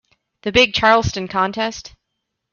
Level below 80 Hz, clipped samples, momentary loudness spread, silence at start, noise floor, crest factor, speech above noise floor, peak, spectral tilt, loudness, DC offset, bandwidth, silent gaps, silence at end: -44 dBFS; under 0.1%; 13 LU; 0.45 s; -77 dBFS; 18 dB; 60 dB; -2 dBFS; -4 dB/octave; -17 LUFS; under 0.1%; 7.2 kHz; none; 0.65 s